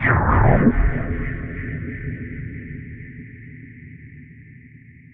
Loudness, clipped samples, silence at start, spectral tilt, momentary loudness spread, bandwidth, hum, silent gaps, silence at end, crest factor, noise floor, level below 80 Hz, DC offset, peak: -21 LUFS; under 0.1%; 0 s; -8.5 dB/octave; 25 LU; 3.6 kHz; none; none; 0.35 s; 22 dB; -45 dBFS; -28 dBFS; under 0.1%; 0 dBFS